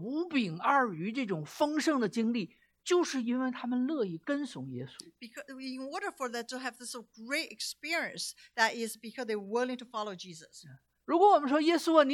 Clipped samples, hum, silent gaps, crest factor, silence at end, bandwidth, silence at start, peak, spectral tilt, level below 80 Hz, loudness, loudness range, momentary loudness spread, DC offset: under 0.1%; none; none; 22 dB; 0 s; 16.5 kHz; 0 s; -10 dBFS; -4 dB/octave; -82 dBFS; -32 LUFS; 7 LU; 18 LU; under 0.1%